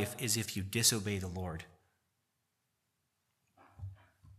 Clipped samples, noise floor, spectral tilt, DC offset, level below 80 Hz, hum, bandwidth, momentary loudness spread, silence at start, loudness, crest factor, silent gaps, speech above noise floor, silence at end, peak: under 0.1%; -83 dBFS; -3 dB/octave; under 0.1%; -64 dBFS; none; 15 kHz; 22 LU; 0 s; -33 LUFS; 26 dB; none; 47 dB; 0.05 s; -14 dBFS